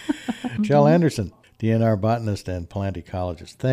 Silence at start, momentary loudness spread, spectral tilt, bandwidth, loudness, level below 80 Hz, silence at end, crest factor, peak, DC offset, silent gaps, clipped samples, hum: 0 s; 13 LU; -7.5 dB/octave; 13 kHz; -22 LUFS; -50 dBFS; 0 s; 16 dB; -6 dBFS; under 0.1%; none; under 0.1%; none